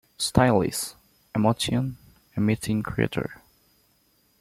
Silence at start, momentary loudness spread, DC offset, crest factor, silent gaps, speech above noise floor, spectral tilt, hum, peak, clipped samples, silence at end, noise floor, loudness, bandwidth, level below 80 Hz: 0.2 s; 13 LU; under 0.1%; 24 dB; none; 41 dB; -5.5 dB/octave; none; -2 dBFS; under 0.1%; 1.05 s; -65 dBFS; -25 LUFS; 16 kHz; -48 dBFS